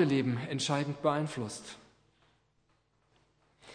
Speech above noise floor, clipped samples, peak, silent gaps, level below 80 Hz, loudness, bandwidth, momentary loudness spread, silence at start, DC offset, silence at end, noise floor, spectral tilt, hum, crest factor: 41 dB; under 0.1%; -14 dBFS; none; -74 dBFS; -33 LUFS; 10.5 kHz; 15 LU; 0 s; under 0.1%; 0 s; -73 dBFS; -5.5 dB/octave; none; 20 dB